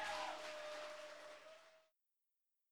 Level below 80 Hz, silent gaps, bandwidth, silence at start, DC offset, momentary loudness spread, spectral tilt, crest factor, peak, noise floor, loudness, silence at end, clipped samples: -86 dBFS; none; over 20 kHz; 0 s; under 0.1%; 17 LU; -0.5 dB/octave; 18 dB; -34 dBFS; -90 dBFS; -50 LUFS; 0 s; under 0.1%